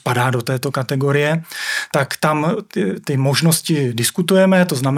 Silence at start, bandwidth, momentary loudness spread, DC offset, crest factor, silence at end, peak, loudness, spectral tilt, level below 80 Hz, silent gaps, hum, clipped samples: 0.05 s; 16.5 kHz; 7 LU; under 0.1%; 16 dB; 0 s; 0 dBFS; -17 LUFS; -5 dB/octave; -64 dBFS; none; none; under 0.1%